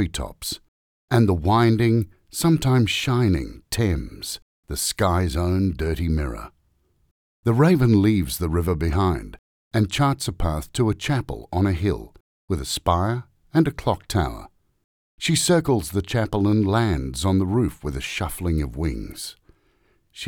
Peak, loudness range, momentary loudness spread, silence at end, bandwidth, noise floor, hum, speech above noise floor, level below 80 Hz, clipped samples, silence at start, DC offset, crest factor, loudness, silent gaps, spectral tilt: -4 dBFS; 4 LU; 12 LU; 0 s; 19.5 kHz; -65 dBFS; none; 44 dB; -38 dBFS; under 0.1%; 0 s; under 0.1%; 18 dB; -22 LUFS; 0.68-1.08 s, 4.42-4.63 s, 7.11-7.43 s, 9.39-9.71 s, 12.20-12.48 s, 14.84-15.18 s; -5.5 dB/octave